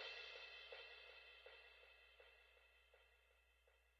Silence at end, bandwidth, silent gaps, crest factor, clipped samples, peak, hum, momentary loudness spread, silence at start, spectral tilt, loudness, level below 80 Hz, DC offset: 0 s; 7.2 kHz; none; 22 dB; under 0.1%; -42 dBFS; none; 13 LU; 0 s; 2.5 dB/octave; -59 LUFS; -82 dBFS; under 0.1%